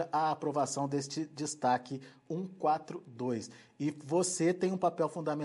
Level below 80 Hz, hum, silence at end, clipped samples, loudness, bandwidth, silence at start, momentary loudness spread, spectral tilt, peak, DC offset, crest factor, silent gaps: -82 dBFS; none; 0 s; under 0.1%; -34 LUFS; 11.5 kHz; 0 s; 10 LU; -5 dB/octave; -18 dBFS; under 0.1%; 16 dB; none